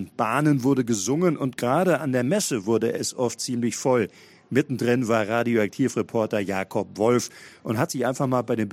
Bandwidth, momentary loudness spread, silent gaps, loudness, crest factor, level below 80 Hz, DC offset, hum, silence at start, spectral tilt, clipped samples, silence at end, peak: 16 kHz; 5 LU; none; -24 LUFS; 18 dB; -66 dBFS; under 0.1%; none; 0 s; -5.5 dB/octave; under 0.1%; 0 s; -6 dBFS